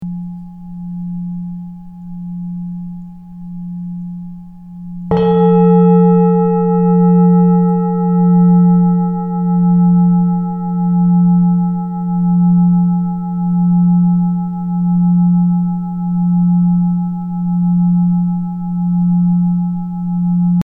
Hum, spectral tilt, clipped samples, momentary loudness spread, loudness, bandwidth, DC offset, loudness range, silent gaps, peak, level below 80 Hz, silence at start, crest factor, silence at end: none; -13 dB/octave; under 0.1%; 18 LU; -13 LUFS; 3.4 kHz; under 0.1%; 15 LU; none; 0 dBFS; -46 dBFS; 0 s; 12 dB; 0 s